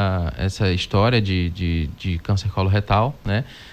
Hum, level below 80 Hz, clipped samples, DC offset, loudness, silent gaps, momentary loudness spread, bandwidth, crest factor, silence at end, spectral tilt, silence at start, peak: none; -30 dBFS; under 0.1%; under 0.1%; -21 LUFS; none; 7 LU; 9 kHz; 14 dB; 0 s; -6.5 dB/octave; 0 s; -6 dBFS